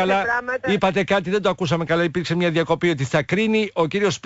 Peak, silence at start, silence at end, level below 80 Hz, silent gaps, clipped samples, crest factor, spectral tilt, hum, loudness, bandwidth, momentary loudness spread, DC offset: -6 dBFS; 0 s; 0.05 s; -52 dBFS; none; under 0.1%; 14 dB; -5.5 dB/octave; none; -20 LUFS; 8 kHz; 3 LU; under 0.1%